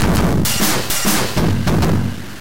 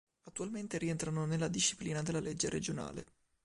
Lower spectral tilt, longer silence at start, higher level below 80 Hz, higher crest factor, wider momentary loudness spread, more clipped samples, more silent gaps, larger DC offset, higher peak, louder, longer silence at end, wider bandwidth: about the same, -4.5 dB/octave vs -4 dB/octave; second, 0 s vs 0.25 s; first, -28 dBFS vs -62 dBFS; second, 12 dB vs 18 dB; second, 3 LU vs 11 LU; neither; neither; first, 9% vs under 0.1%; first, -4 dBFS vs -20 dBFS; first, -16 LUFS vs -37 LUFS; second, 0 s vs 0.4 s; first, 17 kHz vs 11.5 kHz